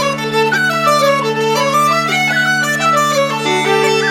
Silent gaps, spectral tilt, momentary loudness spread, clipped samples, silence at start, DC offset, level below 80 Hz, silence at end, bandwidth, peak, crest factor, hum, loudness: none; -3.5 dB/octave; 3 LU; under 0.1%; 0 s; under 0.1%; -56 dBFS; 0 s; 17 kHz; 0 dBFS; 12 dB; none; -13 LUFS